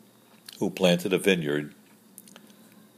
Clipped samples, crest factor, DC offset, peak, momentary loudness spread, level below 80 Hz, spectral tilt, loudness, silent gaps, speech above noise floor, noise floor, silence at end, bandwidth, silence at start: under 0.1%; 22 dB; under 0.1%; -6 dBFS; 15 LU; -72 dBFS; -5 dB/octave; -25 LUFS; none; 29 dB; -54 dBFS; 1.25 s; 15.5 kHz; 0.55 s